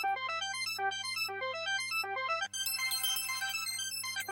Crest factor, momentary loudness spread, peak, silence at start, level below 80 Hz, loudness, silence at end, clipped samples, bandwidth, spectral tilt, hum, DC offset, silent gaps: 14 dB; 4 LU; -20 dBFS; 0 s; -84 dBFS; -33 LUFS; 0 s; under 0.1%; 17 kHz; 1 dB/octave; none; under 0.1%; none